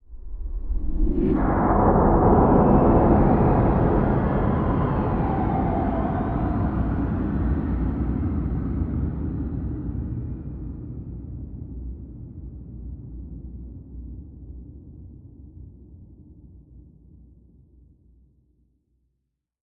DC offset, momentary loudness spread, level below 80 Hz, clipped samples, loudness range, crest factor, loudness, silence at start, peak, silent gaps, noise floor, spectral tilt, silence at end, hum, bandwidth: under 0.1%; 22 LU; -30 dBFS; under 0.1%; 22 LU; 18 dB; -22 LUFS; 0.1 s; -6 dBFS; none; -78 dBFS; -12.5 dB/octave; 2.8 s; none; 4 kHz